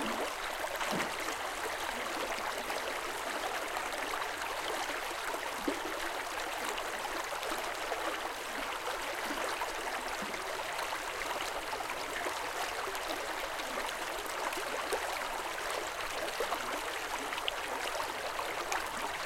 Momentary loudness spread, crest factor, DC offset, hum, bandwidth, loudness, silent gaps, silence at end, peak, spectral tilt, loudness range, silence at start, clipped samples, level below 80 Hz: 2 LU; 24 dB; under 0.1%; none; 17 kHz; -36 LUFS; none; 0 s; -14 dBFS; -1.5 dB/octave; 1 LU; 0 s; under 0.1%; -58 dBFS